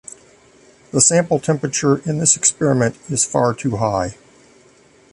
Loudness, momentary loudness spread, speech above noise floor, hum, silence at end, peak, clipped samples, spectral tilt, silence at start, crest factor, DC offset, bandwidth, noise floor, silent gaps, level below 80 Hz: -17 LUFS; 9 LU; 33 dB; none; 1 s; 0 dBFS; under 0.1%; -4 dB/octave; 0.1 s; 20 dB; under 0.1%; 11.5 kHz; -51 dBFS; none; -50 dBFS